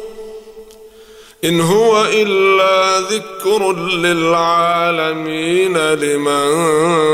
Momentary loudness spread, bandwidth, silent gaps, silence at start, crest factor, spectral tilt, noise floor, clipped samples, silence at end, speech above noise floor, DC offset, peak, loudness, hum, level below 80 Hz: 7 LU; 16 kHz; none; 0 s; 12 dB; -4 dB/octave; -41 dBFS; under 0.1%; 0 s; 27 dB; under 0.1%; -2 dBFS; -14 LUFS; none; -54 dBFS